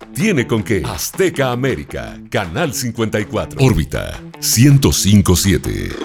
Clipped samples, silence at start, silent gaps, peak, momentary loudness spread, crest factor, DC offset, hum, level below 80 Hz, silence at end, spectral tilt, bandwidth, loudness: under 0.1%; 0 s; none; 0 dBFS; 11 LU; 16 dB; under 0.1%; none; -32 dBFS; 0 s; -5 dB/octave; 18.5 kHz; -16 LUFS